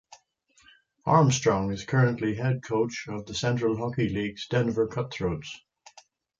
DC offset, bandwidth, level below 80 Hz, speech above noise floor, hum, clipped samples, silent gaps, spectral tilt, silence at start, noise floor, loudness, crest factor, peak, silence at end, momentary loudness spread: under 0.1%; 7.8 kHz; -54 dBFS; 38 dB; none; under 0.1%; none; -6 dB/octave; 0.1 s; -64 dBFS; -27 LUFS; 20 dB; -8 dBFS; 0.85 s; 12 LU